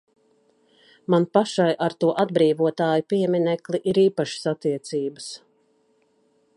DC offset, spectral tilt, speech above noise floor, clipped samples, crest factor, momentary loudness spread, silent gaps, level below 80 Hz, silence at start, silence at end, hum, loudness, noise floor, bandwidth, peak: under 0.1%; -6 dB/octave; 43 dB; under 0.1%; 20 dB; 10 LU; none; -70 dBFS; 1.1 s; 1.2 s; none; -22 LUFS; -64 dBFS; 11.5 kHz; -4 dBFS